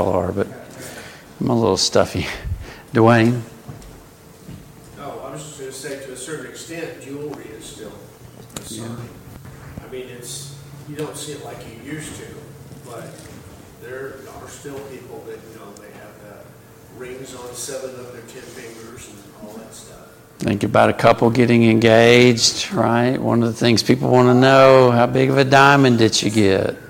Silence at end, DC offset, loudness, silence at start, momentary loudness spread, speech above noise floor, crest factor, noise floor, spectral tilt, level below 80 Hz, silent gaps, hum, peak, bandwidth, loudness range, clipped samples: 0.05 s; under 0.1%; -15 LUFS; 0 s; 26 LU; 27 dB; 18 dB; -44 dBFS; -5 dB/octave; -48 dBFS; none; none; 0 dBFS; 17 kHz; 22 LU; under 0.1%